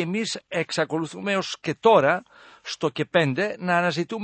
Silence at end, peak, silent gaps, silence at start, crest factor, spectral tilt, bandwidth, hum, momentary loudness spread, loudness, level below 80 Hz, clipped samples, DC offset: 0 s; -4 dBFS; none; 0 s; 20 dB; -5 dB/octave; 8.8 kHz; none; 10 LU; -23 LUFS; -68 dBFS; under 0.1%; under 0.1%